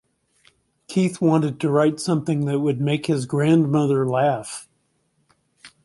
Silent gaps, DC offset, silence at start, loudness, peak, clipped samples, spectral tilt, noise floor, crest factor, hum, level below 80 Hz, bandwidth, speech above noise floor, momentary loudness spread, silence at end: none; under 0.1%; 0.9 s; -21 LUFS; -4 dBFS; under 0.1%; -7 dB/octave; -68 dBFS; 18 dB; none; -64 dBFS; 11.5 kHz; 48 dB; 6 LU; 0.15 s